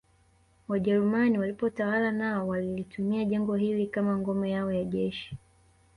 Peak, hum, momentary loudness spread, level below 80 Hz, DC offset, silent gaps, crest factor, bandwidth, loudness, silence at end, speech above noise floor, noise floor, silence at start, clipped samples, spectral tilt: -14 dBFS; none; 8 LU; -60 dBFS; under 0.1%; none; 14 dB; 10.5 kHz; -29 LUFS; 0.6 s; 36 dB; -64 dBFS; 0.7 s; under 0.1%; -8.5 dB/octave